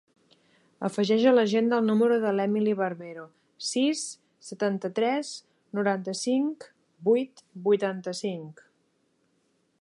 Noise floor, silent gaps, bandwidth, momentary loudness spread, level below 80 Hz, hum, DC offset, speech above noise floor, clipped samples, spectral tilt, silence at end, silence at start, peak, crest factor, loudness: -71 dBFS; none; 11.5 kHz; 17 LU; -82 dBFS; none; under 0.1%; 45 dB; under 0.1%; -5 dB/octave; 1.3 s; 0.8 s; -10 dBFS; 18 dB; -26 LUFS